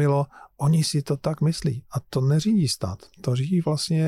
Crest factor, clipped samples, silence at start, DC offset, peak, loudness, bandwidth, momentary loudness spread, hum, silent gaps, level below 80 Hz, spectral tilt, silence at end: 10 dB; under 0.1%; 0 s; under 0.1%; -14 dBFS; -24 LUFS; 14 kHz; 9 LU; none; none; -52 dBFS; -6.5 dB/octave; 0 s